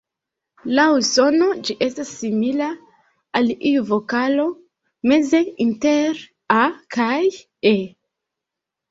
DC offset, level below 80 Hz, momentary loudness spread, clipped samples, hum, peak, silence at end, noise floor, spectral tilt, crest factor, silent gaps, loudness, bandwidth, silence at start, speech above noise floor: under 0.1%; -64 dBFS; 9 LU; under 0.1%; none; -2 dBFS; 1 s; -84 dBFS; -4 dB/octave; 18 dB; none; -19 LUFS; 8 kHz; 0.65 s; 66 dB